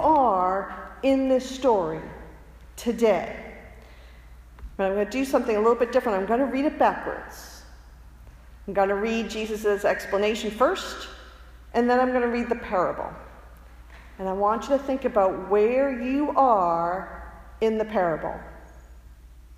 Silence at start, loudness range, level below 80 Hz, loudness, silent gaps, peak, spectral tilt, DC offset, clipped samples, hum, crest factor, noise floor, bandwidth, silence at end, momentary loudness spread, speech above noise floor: 0 s; 4 LU; -48 dBFS; -24 LUFS; none; -6 dBFS; -5.5 dB/octave; under 0.1%; under 0.1%; none; 18 dB; -47 dBFS; 15.5 kHz; 0 s; 19 LU; 23 dB